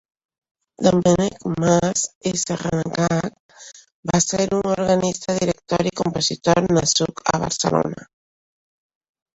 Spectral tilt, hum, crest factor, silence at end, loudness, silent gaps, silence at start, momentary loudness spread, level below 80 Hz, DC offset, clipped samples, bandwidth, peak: -4.5 dB/octave; none; 20 dB; 1.3 s; -20 LUFS; 2.15-2.21 s, 3.40-3.49 s, 3.94-4.03 s; 0.8 s; 6 LU; -48 dBFS; under 0.1%; under 0.1%; 8.2 kHz; -2 dBFS